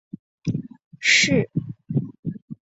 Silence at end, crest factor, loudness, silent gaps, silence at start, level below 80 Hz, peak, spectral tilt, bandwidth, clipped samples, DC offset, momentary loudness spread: 0.1 s; 20 dB; -21 LUFS; 0.85-0.91 s, 2.19-2.23 s, 2.42-2.48 s; 0.45 s; -56 dBFS; -4 dBFS; -3.5 dB/octave; 8.2 kHz; under 0.1%; under 0.1%; 17 LU